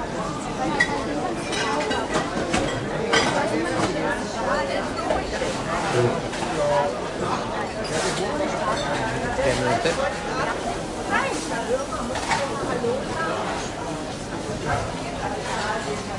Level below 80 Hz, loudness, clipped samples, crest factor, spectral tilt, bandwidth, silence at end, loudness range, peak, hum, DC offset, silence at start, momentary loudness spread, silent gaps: -42 dBFS; -24 LUFS; under 0.1%; 20 dB; -4 dB/octave; 11.5 kHz; 0 s; 3 LU; -6 dBFS; none; under 0.1%; 0 s; 6 LU; none